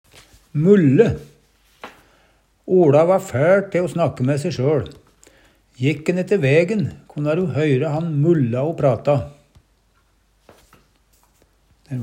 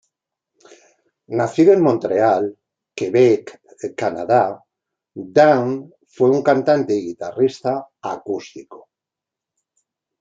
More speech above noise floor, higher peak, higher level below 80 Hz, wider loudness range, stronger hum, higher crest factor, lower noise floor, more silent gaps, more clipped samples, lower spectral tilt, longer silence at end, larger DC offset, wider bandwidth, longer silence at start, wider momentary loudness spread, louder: second, 43 dB vs 69 dB; about the same, -2 dBFS vs 0 dBFS; first, -54 dBFS vs -66 dBFS; about the same, 4 LU vs 4 LU; neither; about the same, 18 dB vs 18 dB; second, -60 dBFS vs -86 dBFS; neither; neither; about the same, -8 dB/octave vs -7 dB/octave; second, 0 s vs 1.45 s; neither; first, 15.5 kHz vs 7.8 kHz; second, 0.55 s vs 1.3 s; second, 11 LU vs 16 LU; about the same, -18 LUFS vs -18 LUFS